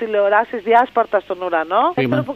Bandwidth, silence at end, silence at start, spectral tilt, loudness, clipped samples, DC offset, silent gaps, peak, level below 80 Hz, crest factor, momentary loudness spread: 6.8 kHz; 0 s; 0 s; -7.5 dB/octave; -17 LUFS; under 0.1%; under 0.1%; none; -2 dBFS; -60 dBFS; 16 dB; 6 LU